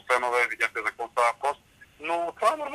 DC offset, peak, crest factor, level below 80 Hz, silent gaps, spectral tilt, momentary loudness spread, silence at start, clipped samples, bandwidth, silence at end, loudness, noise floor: under 0.1%; -8 dBFS; 20 dB; -68 dBFS; none; -1.5 dB/octave; 7 LU; 0.1 s; under 0.1%; 15 kHz; 0 s; -26 LUFS; -51 dBFS